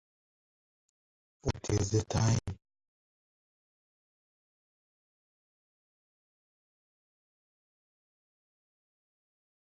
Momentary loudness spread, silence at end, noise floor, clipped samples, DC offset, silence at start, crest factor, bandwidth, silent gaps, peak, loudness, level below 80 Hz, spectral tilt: 13 LU; 7.2 s; under -90 dBFS; under 0.1%; under 0.1%; 1.45 s; 22 dB; 9.6 kHz; none; -18 dBFS; -32 LUFS; -54 dBFS; -5.5 dB/octave